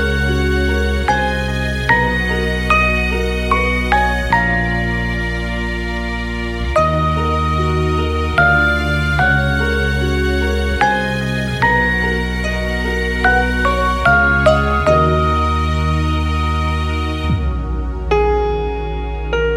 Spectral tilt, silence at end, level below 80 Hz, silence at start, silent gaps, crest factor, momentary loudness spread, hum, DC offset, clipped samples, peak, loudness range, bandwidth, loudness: -6 dB/octave; 0 s; -22 dBFS; 0 s; none; 14 dB; 8 LU; none; under 0.1%; under 0.1%; -2 dBFS; 4 LU; 13.5 kHz; -16 LUFS